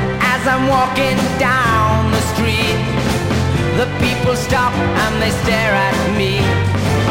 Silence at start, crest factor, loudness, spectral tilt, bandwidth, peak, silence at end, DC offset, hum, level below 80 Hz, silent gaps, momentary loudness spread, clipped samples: 0 s; 12 dB; -15 LUFS; -5 dB/octave; 16 kHz; -2 dBFS; 0 s; under 0.1%; none; -30 dBFS; none; 3 LU; under 0.1%